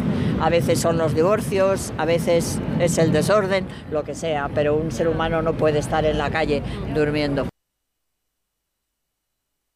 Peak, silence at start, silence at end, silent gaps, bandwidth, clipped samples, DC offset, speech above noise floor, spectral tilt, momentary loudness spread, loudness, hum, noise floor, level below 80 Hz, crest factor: -6 dBFS; 0 s; 2.25 s; none; 15.5 kHz; under 0.1%; under 0.1%; 58 dB; -5.5 dB/octave; 7 LU; -21 LUFS; none; -78 dBFS; -40 dBFS; 14 dB